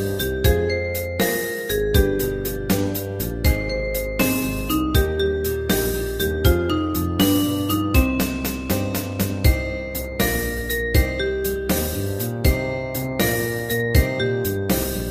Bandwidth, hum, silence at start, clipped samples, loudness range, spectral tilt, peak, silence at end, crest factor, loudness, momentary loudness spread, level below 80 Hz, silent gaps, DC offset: 15.5 kHz; none; 0 s; under 0.1%; 2 LU; -5 dB/octave; -2 dBFS; 0 s; 18 dB; -22 LUFS; 6 LU; -28 dBFS; none; under 0.1%